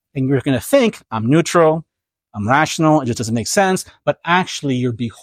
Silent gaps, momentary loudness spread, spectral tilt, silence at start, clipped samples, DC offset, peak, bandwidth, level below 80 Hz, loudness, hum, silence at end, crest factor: none; 8 LU; -5 dB/octave; 0.15 s; under 0.1%; under 0.1%; -2 dBFS; 16 kHz; -54 dBFS; -17 LUFS; none; 0.1 s; 16 dB